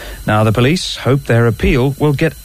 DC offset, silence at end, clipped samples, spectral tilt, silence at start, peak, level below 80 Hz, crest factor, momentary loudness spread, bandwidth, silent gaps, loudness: under 0.1%; 0 s; under 0.1%; -6 dB/octave; 0 s; -2 dBFS; -28 dBFS; 10 dB; 4 LU; 16 kHz; none; -14 LUFS